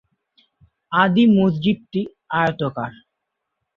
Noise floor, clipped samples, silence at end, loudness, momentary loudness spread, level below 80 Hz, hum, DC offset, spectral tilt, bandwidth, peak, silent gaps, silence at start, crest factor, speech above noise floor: -79 dBFS; under 0.1%; 0.85 s; -19 LUFS; 12 LU; -58 dBFS; none; under 0.1%; -8.5 dB/octave; 5.6 kHz; -2 dBFS; none; 0.9 s; 20 dB; 61 dB